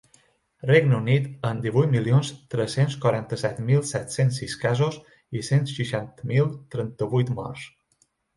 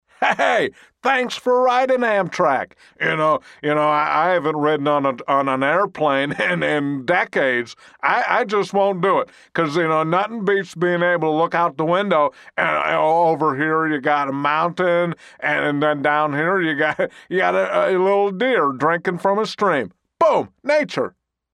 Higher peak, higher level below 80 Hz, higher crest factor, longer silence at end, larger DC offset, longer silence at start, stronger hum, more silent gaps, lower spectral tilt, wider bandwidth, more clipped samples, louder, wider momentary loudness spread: second, -4 dBFS vs 0 dBFS; first, -58 dBFS vs -66 dBFS; about the same, 20 dB vs 18 dB; first, 0.7 s vs 0.45 s; neither; first, 0.65 s vs 0.2 s; neither; neither; about the same, -6.5 dB/octave vs -6 dB/octave; about the same, 11.5 kHz vs 11 kHz; neither; second, -24 LUFS vs -19 LUFS; first, 12 LU vs 5 LU